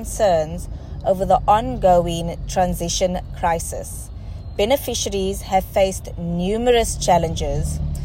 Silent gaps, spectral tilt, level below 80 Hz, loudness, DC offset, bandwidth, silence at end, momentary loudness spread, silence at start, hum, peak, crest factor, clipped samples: none; -4.5 dB/octave; -30 dBFS; -20 LUFS; under 0.1%; 16.5 kHz; 0 s; 12 LU; 0 s; none; -4 dBFS; 16 dB; under 0.1%